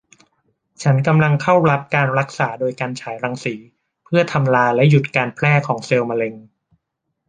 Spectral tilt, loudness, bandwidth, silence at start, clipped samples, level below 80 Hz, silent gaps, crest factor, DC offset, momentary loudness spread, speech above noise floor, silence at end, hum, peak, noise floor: -7 dB/octave; -17 LUFS; 9.4 kHz; 0.8 s; under 0.1%; -58 dBFS; none; 18 dB; under 0.1%; 11 LU; 59 dB; 0.85 s; none; 0 dBFS; -76 dBFS